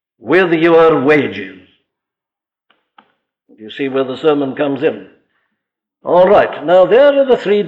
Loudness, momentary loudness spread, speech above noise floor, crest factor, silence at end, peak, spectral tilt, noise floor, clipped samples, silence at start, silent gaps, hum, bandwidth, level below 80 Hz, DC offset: -12 LUFS; 16 LU; 75 dB; 12 dB; 0 s; -2 dBFS; -7.5 dB/octave; -87 dBFS; under 0.1%; 0.25 s; none; none; 7.4 kHz; -54 dBFS; under 0.1%